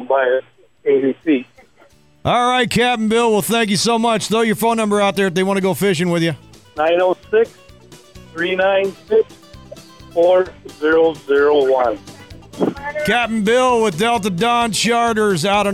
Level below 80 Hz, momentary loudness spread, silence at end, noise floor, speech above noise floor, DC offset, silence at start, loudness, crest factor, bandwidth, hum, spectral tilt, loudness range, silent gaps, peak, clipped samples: -48 dBFS; 8 LU; 0 s; -51 dBFS; 35 dB; 0.1%; 0 s; -16 LUFS; 10 dB; 16 kHz; none; -4.5 dB/octave; 3 LU; none; -6 dBFS; under 0.1%